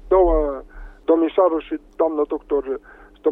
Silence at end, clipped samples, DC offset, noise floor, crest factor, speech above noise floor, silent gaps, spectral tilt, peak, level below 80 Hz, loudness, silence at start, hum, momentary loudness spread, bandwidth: 0 s; under 0.1%; under 0.1%; -38 dBFS; 14 dB; 17 dB; none; -9.5 dB/octave; -6 dBFS; -34 dBFS; -20 LUFS; 0.05 s; none; 14 LU; 3.9 kHz